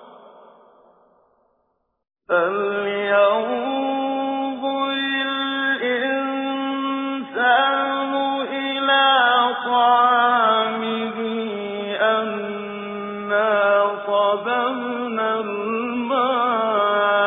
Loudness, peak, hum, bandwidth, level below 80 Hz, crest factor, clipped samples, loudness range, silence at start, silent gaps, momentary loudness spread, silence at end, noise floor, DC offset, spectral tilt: -20 LUFS; -4 dBFS; none; 3.9 kHz; -72 dBFS; 16 dB; under 0.1%; 5 LU; 0 s; none; 10 LU; 0 s; -70 dBFS; under 0.1%; -7 dB/octave